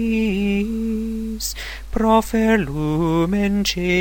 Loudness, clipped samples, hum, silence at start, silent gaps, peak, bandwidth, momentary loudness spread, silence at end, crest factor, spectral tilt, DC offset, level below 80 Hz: -20 LUFS; under 0.1%; none; 0 s; none; -4 dBFS; 17.5 kHz; 9 LU; 0 s; 16 dB; -5.5 dB/octave; 0.3%; -34 dBFS